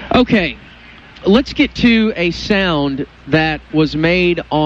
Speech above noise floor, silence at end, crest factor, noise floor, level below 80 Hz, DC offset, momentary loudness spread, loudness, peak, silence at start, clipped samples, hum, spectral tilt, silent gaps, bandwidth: 24 dB; 0 s; 14 dB; -39 dBFS; -36 dBFS; under 0.1%; 8 LU; -15 LUFS; 0 dBFS; 0 s; under 0.1%; none; -6.5 dB/octave; none; 7.6 kHz